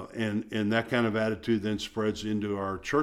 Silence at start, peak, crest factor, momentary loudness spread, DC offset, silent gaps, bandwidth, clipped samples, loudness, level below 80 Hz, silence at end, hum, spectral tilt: 0 s; -12 dBFS; 18 dB; 5 LU; under 0.1%; none; 14 kHz; under 0.1%; -29 LUFS; -56 dBFS; 0 s; none; -6 dB/octave